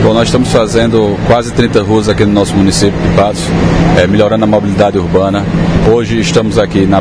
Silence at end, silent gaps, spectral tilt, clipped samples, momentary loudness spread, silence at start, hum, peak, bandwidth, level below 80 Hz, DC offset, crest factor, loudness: 0 s; none; -6 dB/octave; 0.8%; 2 LU; 0 s; none; 0 dBFS; 10.5 kHz; -24 dBFS; under 0.1%; 8 dB; -9 LUFS